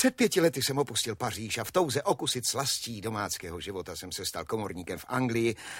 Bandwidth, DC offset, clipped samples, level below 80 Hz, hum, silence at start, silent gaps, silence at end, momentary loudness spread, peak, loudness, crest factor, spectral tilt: 16.5 kHz; under 0.1%; under 0.1%; -60 dBFS; none; 0 s; none; 0 s; 11 LU; -10 dBFS; -30 LUFS; 20 dB; -3.5 dB/octave